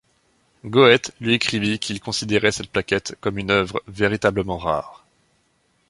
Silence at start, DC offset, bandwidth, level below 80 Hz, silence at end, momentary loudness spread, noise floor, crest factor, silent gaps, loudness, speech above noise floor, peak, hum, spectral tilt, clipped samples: 0.65 s; under 0.1%; 11.5 kHz; -48 dBFS; 0.95 s; 12 LU; -65 dBFS; 20 dB; none; -20 LUFS; 44 dB; 0 dBFS; none; -4.5 dB/octave; under 0.1%